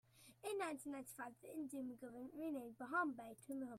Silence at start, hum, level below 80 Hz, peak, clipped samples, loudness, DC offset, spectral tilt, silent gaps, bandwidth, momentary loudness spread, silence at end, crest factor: 0.15 s; none; -86 dBFS; -28 dBFS; under 0.1%; -48 LUFS; under 0.1%; -4 dB/octave; none; 16 kHz; 11 LU; 0 s; 20 dB